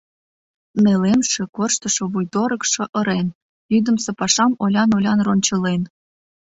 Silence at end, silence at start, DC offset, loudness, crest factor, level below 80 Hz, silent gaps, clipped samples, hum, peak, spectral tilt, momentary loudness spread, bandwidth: 0.7 s; 0.75 s; under 0.1%; -19 LUFS; 16 dB; -56 dBFS; 1.49-1.53 s, 2.89-2.93 s, 3.35-3.69 s; under 0.1%; none; -2 dBFS; -4 dB/octave; 6 LU; 8 kHz